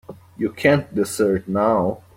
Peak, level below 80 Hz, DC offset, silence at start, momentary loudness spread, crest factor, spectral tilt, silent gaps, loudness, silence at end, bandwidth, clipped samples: -2 dBFS; -54 dBFS; under 0.1%; 0.1 s; 8 LU; 18 dB; -6 dB/octave; none; -20 LUFS; 0.2 s; 16.5 kHz; under 0.1%